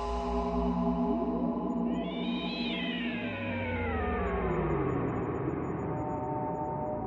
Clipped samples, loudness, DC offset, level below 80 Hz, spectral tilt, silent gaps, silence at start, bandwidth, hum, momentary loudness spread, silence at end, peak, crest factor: under 0.1%; -32 LUFS; under 0.1%; -44 dBFS; -8 dB/octave; none; 0 s; 7.6 kHz; none; 4 LU; 0 s; -18 dBFS; 14 dB